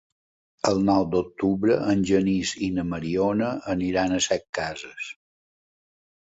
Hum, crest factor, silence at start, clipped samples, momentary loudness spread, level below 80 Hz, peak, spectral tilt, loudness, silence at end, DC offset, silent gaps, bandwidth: none; 20 dB; 0.65 s; under 0.1%; 9 LU; -52 dBFS; -6 dBFS; -5 dB/octave; -24 LUFS; 1.2 s; under 0.1%; 4.49-4.53 s; 8 kHz